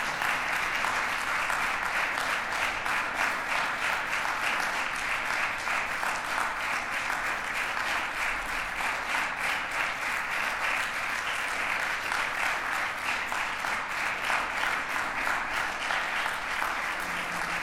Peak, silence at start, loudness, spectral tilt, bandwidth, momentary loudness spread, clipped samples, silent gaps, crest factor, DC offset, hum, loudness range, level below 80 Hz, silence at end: -12 dBFS; 0 s; -28 LUFS; -1 dB/octave; 17 kHz; 2 LU; under 0.1%; none; 18 dB; under 0.1%; none; 1 LU; -54 dBFS; 0 s